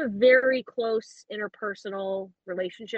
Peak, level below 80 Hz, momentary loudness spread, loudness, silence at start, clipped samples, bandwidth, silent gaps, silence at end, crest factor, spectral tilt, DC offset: -8 dBFS; -72 dBFS; 16 LU; -26 LUFS; 0 s; under 0.1%; 8.2 kHz; none; 0 s; 18 dB; -5 dB/octave; under 0.1%